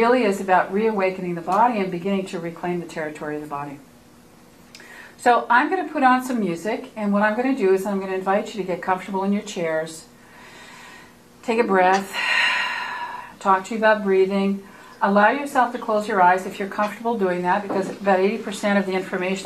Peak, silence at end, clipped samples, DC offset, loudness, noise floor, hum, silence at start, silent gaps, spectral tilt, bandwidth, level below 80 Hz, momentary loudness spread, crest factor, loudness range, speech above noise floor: -4 dBFS; 0 s; under 0.1%; under 0.1%; -21 LUFS; -49 dBFS; none; 0 s; none; -5.5 dB/octave; 14.5 kHz; -64 dBFS; 13 LU; 18 dB; 6 LU; 28 dB